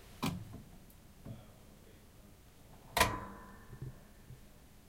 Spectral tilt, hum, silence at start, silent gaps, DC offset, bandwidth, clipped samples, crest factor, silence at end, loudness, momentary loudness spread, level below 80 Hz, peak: -3.5 dB/octave; none; 0 s; none; under 0.1%; 16 kHz; under 0.1%; 32 dB; 0 s; -37 LUFS; 27 LU; -56 dBFS; -10 dBFS